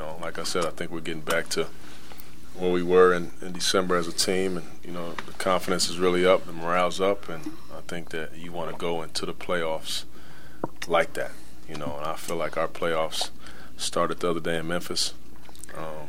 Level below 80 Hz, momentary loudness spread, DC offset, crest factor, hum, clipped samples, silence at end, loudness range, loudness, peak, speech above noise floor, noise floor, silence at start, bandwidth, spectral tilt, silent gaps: -54 dBFS; 16 LU; 4%; 22 dB; none; under 0.1%; 0 s; 6 LU; -27 LUFS; -6 dBFS; 21 dB; -48 dBFS; 0 s; 16 kHz; -3.5 dB/octave; none